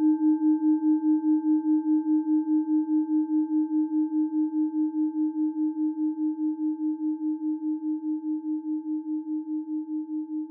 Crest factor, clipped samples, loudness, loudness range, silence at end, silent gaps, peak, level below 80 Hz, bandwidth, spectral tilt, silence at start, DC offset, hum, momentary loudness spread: 10 dB; under 0.1%; -26 LUFS; 6 LU; 0 s; none; -16 dBFS; under -90 dBFS; 1.7 kHz; -12 dB/octave; 0 s; under 0.1%; none; 8 LU